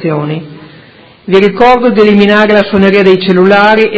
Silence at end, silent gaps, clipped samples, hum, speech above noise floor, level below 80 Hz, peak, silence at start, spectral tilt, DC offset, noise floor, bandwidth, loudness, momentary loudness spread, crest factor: 0 s; none; 3%; none; 31 dB; -40 dBFS; 0 dBFS; 0 s; -7.5 dB/octave; under 0.1%; -37 dBFS; 8 kHz; -6 LUFS; 10 LU; 8 dB